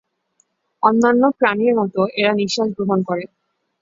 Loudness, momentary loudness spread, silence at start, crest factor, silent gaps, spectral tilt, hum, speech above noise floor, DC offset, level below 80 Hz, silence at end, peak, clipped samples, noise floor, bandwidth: -17 LUFS; 7 LU; 0.8 s; 18 dB; none; -5.5 dB/octave; none; 48 dB; under 0.1%; -62 dBFS; 0.55 s; 0 dBFS; under 0.1%; -64 dBFS; 7.8 kHz